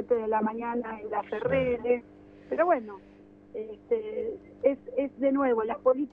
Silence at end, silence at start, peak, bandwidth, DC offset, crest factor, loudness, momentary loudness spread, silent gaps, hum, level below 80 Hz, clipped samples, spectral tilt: 0.05 s; 0 s; -10 dBFS; 3.8 kHz; under 0.1%; 18 dB; -29 LUFS; 13 LU; none; 50 Hz at -60 dBFS; -60 dBFS; under 0.1%; -9 dB/octave